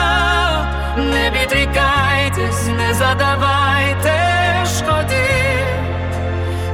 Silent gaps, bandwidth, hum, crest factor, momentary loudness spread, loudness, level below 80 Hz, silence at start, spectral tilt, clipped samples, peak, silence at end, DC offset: none; 16.5 kHz; none; 14 dB; 6 LU; -16 LUFS; -26 dBFS; 0 s; -4.5 dB/octave; under 0.1%; -2 dBFS; 0 s; under 0.1%